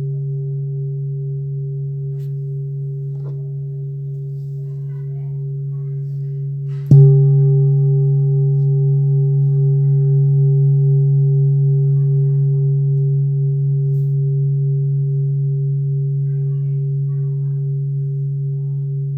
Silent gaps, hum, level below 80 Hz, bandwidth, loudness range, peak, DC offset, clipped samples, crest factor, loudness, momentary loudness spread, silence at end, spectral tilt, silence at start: none; none; -56 dBFS; 0.8 kHz; 11 LU; 0 dBFS; under 0.1%; under 0.1%; 16 dB; -17 LUFS; 12 LU; 0 s; -14 dB/octave; 0 s